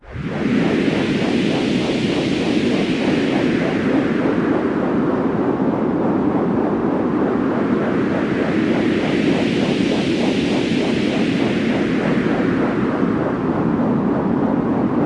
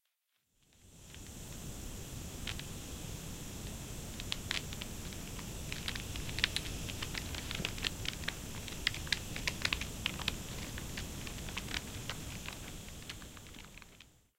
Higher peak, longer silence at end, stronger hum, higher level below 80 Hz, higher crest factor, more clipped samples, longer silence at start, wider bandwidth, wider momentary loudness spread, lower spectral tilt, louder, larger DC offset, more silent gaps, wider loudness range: first, -4 dBFS vs -8 dBFS; second, 0 s vs 0.2 s; neither; about the same, -46 dBFS vs -50 dBFS; second, 14 dB vs 34 dB; neither; second, 0.05 s vs 0.7 s; second, 11 kHz vs 17 kHz; second, 1 LU vs 13 LU; first, -7 dB/octave vs -2.5 dB/octave; first, -18 LUFS vs -40 LUFS; neither; neither; second, 1 LU vs 7 LU